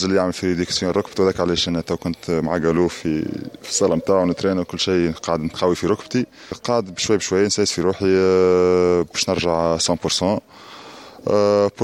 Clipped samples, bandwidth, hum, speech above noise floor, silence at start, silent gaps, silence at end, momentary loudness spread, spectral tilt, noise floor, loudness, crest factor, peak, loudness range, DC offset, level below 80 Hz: under 0.1%; 14 kHz; none; 21 dB; 0 s; none; 0 s; 9 LU; -4.5 dB/octave; -40 dBFS; -19 LUFS; 16 dB; -4 dBFS; 3 LU; under 0.1%; -48 dBFS